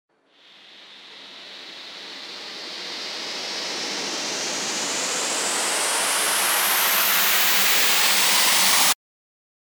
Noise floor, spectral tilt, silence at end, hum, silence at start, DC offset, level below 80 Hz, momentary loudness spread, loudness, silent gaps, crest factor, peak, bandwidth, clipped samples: -54 dBFS; 1 dB/octave; 0.75 s; none; 0.7 s; under 0.1%; -78 dBFS; 20 LU; -19 LUFS; none; 20 dB; -4 dBFS; over 20 kHz; under 0.1%